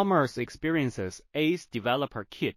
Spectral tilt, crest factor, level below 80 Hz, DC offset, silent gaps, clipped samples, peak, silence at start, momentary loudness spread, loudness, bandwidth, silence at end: -6 dB/octave; 16 dB; -60 dBFS; under 0.1%; none; under 0.1%; -12 dBFS; 0 s; 8 LU; -29 LUFS; 15.5 kHz; 0.05 s